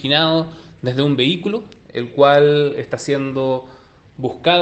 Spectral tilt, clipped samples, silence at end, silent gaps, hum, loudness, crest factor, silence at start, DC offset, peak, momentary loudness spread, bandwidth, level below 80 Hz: -6 dB/octave; under 0.1%; 0 s; none; none; -17 LUFS; 16 dB; 0 s; under 0.1%; 0 dBFS; 14 LU; 8.8 kHz; -56 dBFS